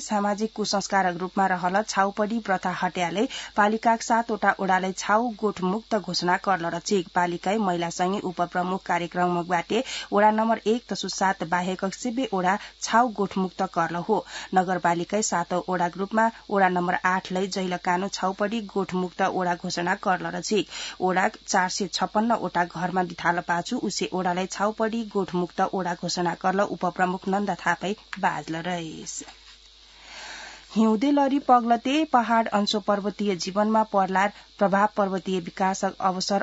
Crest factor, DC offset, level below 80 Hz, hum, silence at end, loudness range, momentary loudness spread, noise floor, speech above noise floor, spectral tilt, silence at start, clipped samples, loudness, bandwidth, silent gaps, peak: 20 dB; under 0.1%; -60 dBFS; none; 0 s; 3 LU; 6 LU; -51 dBFS; 26 dB; -4.5 dB/octave; 0 s; under 0.1%; -25 LUFS; 8 kHz; none; -6 dBFS